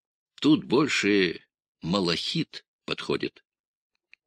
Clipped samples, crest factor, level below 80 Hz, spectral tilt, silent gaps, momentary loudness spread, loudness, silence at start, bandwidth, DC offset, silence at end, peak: under 0.1%; 20 dB; -64 dBFS; -5 dB/octave; 1.68-1.75 s, 2.68-2.79 s; 14 LU; -26 LUFS; 0.4 s; 10.5 kHz; under 0.1%; 0.95 s; -8 dBFS